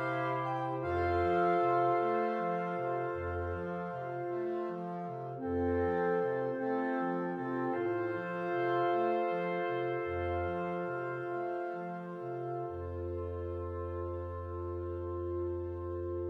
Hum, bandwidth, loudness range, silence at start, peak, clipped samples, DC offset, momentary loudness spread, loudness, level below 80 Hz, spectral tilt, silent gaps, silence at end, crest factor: none; 5.6 kHz; 7 LU; 0 s; -18 dBFS; under 0.1%; under 0.1%; 9 LU; -35 LUFS; -56 dBFS; -9 dB/octave; none; 0 s; 16 dB